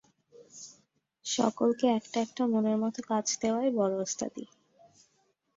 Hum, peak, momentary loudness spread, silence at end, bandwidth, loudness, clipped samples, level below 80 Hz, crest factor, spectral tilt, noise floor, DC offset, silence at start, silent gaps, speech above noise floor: none; -12 dBFS; 20 LU; 1.1 s; 7.8 kHz; -30 LUFS; under 0.1%; -74 dBFS; 18 dB; -4 dB/octave; -73 dBFS; under 0.1%; 0.4 s; none; 44 dB